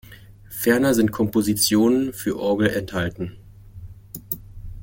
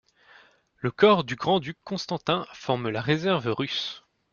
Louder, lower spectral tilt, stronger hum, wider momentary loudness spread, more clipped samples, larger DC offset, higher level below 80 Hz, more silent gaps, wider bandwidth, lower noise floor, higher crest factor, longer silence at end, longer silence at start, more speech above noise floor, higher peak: first, -21 LUFS vs -26 LUFS; second, -4.5 dB/octave vs -6 dB/octave; neither; first, 19 LU vs 13 LU; neither; neither; first, -46 dBFS vs -64 dBFS; neither; first, 17 kHz vs 7.2 kHz; second, -44 dBFS vs -57 dBFS; about the same, 18 dB vs 22 dB; second, 0 s vs 0.35 s; second, 0.1 s vs 0.85 s; second, 24 dB vs 32 dB; about the same, -4 dBFS vs -6 dBFS